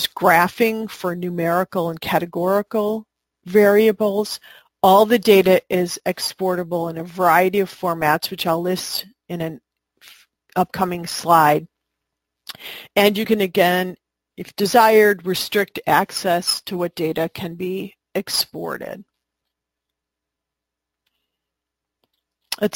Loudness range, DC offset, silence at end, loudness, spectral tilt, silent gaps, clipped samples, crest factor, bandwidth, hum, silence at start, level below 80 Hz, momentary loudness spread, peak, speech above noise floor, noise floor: 9 LU; under 0.1%; 0.05 s; -19 LUFS; -4.5 dB/octave; none; under 0.1%; 20 dB; 17 kHz; none; 0 s; -60 dBFS; 15 LU; 0 dBFS; 65 dB; -84 dBFS